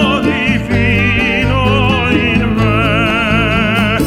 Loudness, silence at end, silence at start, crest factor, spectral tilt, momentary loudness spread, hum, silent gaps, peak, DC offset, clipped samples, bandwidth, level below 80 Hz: -12 LUFS; 0 s; 0 s; 12 dB; -6.5 dB/octave; 2 LU; none; none; 0 dBFS; under 0.1%; under 0.1%; 15.5 kHz; -24 dBFS